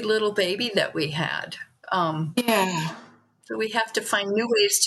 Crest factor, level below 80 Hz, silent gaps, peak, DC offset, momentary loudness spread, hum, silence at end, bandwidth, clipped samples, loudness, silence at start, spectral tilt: 20 dB; -74 dBFS; none; -6 dBFS; under 0.1%; 11 LU; none; 0 s; 13 kHz; under 0.1%; -24 LUFS; 0 s; -3 dB/octave